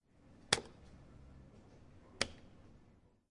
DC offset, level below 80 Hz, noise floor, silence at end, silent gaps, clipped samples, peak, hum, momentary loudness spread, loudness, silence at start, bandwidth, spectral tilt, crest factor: under 0.1%; -64 dBFS; -67 dBFS; 0.2 s; none; under 0.1%; -10 dBFS; none; 26 LU; -38 LUFS; 0.15 s; 11 kHz; -1.5 dB/octave; 36 dB